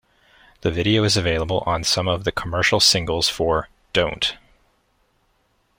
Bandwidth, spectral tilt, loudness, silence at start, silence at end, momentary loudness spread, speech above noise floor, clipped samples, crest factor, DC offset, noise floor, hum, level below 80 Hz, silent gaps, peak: 16.5 kHz; -3.5 dB/octave; -20 LUFS; 0.65 s; 1.45 s; 9 LU; 45 dB; under 0.1%; 20 dB; under 0.1%; -65 dBFS; none; -42 dBFS; none; -4 dBFS